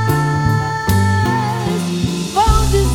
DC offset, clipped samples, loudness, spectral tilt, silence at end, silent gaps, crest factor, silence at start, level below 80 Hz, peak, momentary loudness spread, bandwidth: under 0.1%; under 0.1%; -16 LUFS; -5.5 dB/octave; 0 s; none; 14 dB; 0 s; -22 dBFS; 0 dBFS; 5 LU; 18.5 kHz